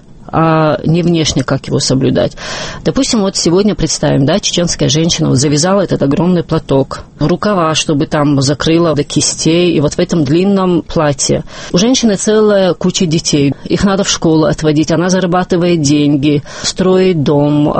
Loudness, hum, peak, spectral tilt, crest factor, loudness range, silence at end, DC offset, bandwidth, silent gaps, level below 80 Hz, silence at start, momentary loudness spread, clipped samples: -11 LUFS; none; 0 dBFS; -5 dB/octave; 12 dB; 1 LU; 0 s; under 0.1%; 8.8 kHz; none; -34 dBFS; 0.1 s; 4 LU; under 0.1%